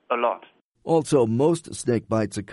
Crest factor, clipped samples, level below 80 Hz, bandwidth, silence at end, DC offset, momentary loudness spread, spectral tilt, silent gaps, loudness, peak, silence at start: 16 dB; under 0.1%; -60 dBFS; 11.5 kHz; 0 s; under 0.1%; 7 LU; -6 dB/octave; 0.61-0.72 s; -23 LUFS; -6 dBFS; 0.1 s